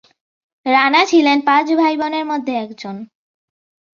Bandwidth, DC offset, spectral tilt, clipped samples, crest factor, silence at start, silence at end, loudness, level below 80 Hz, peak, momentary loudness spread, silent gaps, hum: 7.2 kHz; under 0.1%; -3.5 dB/octave; under 0.1%; 16 dB; 0.65 s; 0.9 s; -15 LUFS; -66 dBFS; -2 dBFS; 17 LU; none; none